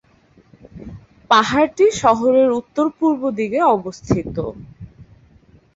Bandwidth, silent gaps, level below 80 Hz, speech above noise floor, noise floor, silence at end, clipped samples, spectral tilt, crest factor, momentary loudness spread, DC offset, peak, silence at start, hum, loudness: 8 kHz; none; -46 dBFS; 37 dB; -53 dBFS; 0.75 s; under 0.1%; -5.5 dB/octave; 18 dB; 23 LU; under 0.1%; -2 dBFS; 0.75 s; none; -17 LUFS